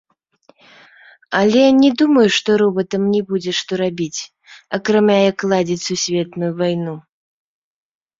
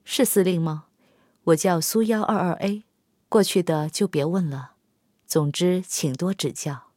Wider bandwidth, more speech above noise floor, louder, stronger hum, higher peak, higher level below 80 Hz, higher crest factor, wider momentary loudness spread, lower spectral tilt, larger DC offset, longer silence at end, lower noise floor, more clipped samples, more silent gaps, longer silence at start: second, 7.8 kHz vs 16.5 kHz; second, 39 dB vs 46 dB; first, -16 LUFS vs -23 LUFS; neither; first, -2 dBFS vs -6 dBFS; first, -60 dBFS vs -70 dBFS; about the same, 16 dB vs 18 dB; first, 12 LU vs 9 LU; about the same, -5 dB/octave vs -5 dB/octave; neither; first, 1.2 s vs 0.15 s; second, -55 dBFS vs -68 dBFS; neither; neither; first, 1.3 s vs 0.05 s